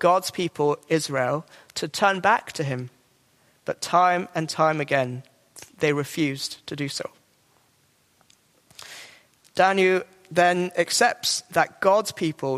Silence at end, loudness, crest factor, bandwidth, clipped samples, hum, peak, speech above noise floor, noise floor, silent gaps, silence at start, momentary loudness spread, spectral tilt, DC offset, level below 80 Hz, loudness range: 0 s; -23 LUFS; 20 dB; 15.5 kHz; under 0.1%; none; -4 dBFS; 40 dB; -64 dBFS; none; 0 s; 14 LU; -4 dB/octave; under 0.1%; -70 dBFS; 8 LU